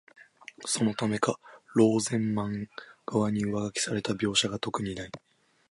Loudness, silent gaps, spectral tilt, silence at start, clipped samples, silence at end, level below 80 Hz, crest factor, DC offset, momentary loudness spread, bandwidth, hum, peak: -29 LUFS; none; -4.5 dB/octave; 0.2 s; under 0.1%; 0.55 s; -60 dBFS; 20 dB; under 0.1%; 18 LU; 11.5 kHz; none; -10 dBFS